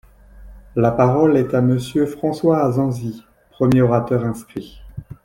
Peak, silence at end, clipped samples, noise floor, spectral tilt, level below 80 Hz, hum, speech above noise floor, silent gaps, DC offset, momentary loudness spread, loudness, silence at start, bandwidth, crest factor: -2 dBFS; 0.1 s; under 0.1%; -42 dBFS; -8.5 dB/octave; -44 dBFS; none; 25 dB; none; under 0.1%; 18 LU; -18 LUFS; 0.35 s; 16 kHz; 16 dB